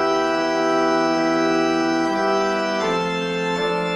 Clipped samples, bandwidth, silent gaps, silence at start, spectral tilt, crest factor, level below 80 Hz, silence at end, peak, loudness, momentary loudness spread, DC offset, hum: under 0.1%; 11 kHz; none; 0 s; -4.5 dB/octave; 12 dB; -54 dBFS; 0 s; -8 dBFS; -20 LUFS; 3 LU; under 0.1%; none